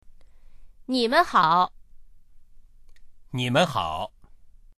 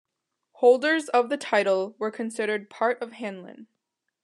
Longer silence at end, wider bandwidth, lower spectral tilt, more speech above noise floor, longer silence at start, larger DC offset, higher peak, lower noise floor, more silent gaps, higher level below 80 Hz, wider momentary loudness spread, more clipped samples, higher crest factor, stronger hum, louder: second, 0.3 s vs 0.6 s; first, 14.5 kHz vs 11 kHz; about the same, -5 dB/octave vs -4 dB/octave; second, 26 dB vs 57 dB; second, 0.05 s vs 0.6 s; neither; about the same, -6 dBFS vs -8 dBFS; second, -48 dBFS vs -81 dBFS; neither; first, -50 dBFS vs under -90 dBFS; about the same, 16 LU vs 14 LU; neither; about the same, 22 dB vs 18 dB; neither; about the same, -23 LUFS vs -24 LUFS